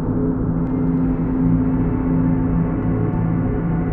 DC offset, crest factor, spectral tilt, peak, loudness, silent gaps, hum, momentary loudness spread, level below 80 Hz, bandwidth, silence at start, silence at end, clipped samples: under 0.1%; 12 dB; -13.5 dB/octave; -6 dBFS; -19 LUFS; none; none; 3 LU; -28 dBFS; 3 kHz; 0 s; 0 s; under 0.1%